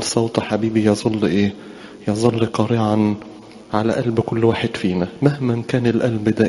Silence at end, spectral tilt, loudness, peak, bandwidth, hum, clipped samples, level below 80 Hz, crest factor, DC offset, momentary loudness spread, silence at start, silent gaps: 0 s; -6.5 dB/octave; -19 LUFS; 0 dBFS; 11.5 kHz; none; under 0.1%; -50 dBFS; 18 dB; under 0.1%; 7 LU; 0 s; none